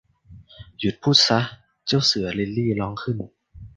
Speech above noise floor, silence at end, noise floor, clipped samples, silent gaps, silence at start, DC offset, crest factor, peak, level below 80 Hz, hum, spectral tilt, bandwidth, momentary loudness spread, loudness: 26 dB; 0.1 s; -48 dBFS; under 0.1%; none; 0.3 s; under 0.1%; 22 dB; -2 dBFS; -50 dBFS; none; -4.5 dB/octave; 9.8 kHz; 15 LU; -21 LUFS